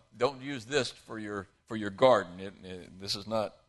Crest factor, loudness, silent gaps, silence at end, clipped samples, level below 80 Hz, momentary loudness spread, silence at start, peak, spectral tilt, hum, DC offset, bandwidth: 22 dB; -31 LUFS; none; 0.2 s; under 0.1%; -64 dBFS; 18 LU; 0.15 s; -10 dBFS; -4.5 dB/octave; none; under 0.1%; 12.5 kHz